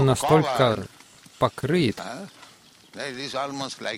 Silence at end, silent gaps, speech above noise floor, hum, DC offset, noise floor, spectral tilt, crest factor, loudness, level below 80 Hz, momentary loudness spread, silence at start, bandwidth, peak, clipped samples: 0 s; none; 28 dB; none; under 0.1%; -52 dBFS; -5.5 dB/octave; 20 dB; -24 LUFS; -54 dBFS; 19 LU; 0 s; 16.5 kHz; -6 dBFS; under 0.1%